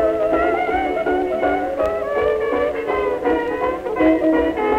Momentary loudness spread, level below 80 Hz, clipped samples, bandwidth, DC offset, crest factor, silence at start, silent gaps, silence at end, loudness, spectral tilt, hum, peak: 4 LU; -40 dBFS; under 0.1%; 14.5 kHz; under 0.1%; 12 dB; 0 s; none; 0 s; -19 LUFS; -7 dB/octave; none; -6 dBFS